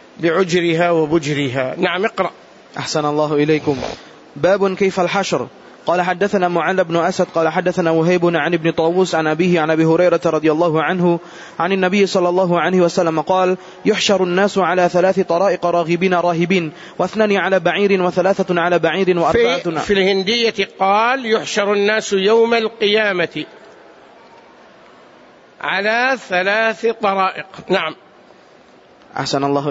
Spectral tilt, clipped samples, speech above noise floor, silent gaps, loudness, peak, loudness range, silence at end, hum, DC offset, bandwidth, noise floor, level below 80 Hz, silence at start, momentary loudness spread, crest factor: -5 dB/octave; under 0.1%; 30 dB; none; -16 LUFS; -4 dBFS; 4 LU; 0 s; none; under 0.1%; 8 kHz; -46 dBFS; -54 dBFS; 0.2 s; 6 LU; 14 dB